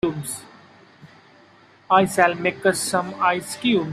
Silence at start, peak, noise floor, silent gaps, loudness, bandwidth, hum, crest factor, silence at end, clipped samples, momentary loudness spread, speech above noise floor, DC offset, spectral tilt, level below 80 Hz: 0.05 s; -2 dBFS; -52 dBFS; none; -21 LUFS; 15 kHz; none; 20 dB; 0 s; under 0.1%; 11 LU; 31 dB; under 0.1%; -4 dB/octave; -60 dBFS